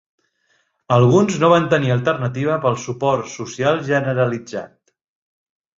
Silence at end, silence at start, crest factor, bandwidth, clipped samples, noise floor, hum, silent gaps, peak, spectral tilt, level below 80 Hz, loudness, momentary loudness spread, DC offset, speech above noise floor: 1.1 s; 0.9 s; 18 dB; 7.6 kHz; under 0.1%; -65 dBFS; none; none; -2 dBFS; -6.5 dB/octave; -56 dBFS; -18 LUFS; 9 LU; under 0.1%; 47 dB